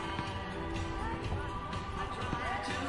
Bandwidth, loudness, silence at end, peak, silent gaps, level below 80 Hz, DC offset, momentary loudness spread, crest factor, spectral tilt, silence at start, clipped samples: 11.5 kHz; -37 LUFS; 0 s; -22 dBFS; none; -46 dBFS; 0.1%; 4 LU; 14 dB; -5.5 dB/octave; 0 s; under 0.1%